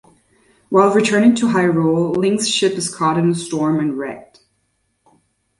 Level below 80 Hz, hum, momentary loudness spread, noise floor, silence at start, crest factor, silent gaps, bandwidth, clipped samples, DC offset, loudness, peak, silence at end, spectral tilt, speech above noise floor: -58 dBFS; none; 7 LU; -67 dBFS; 0.7 s; 16 dB; none; 11.5 kHz; under 0.1%; under 0.1%; -16 LUFS; -2 dBFS; 1.4 s; -5 dB/octave; 51 dB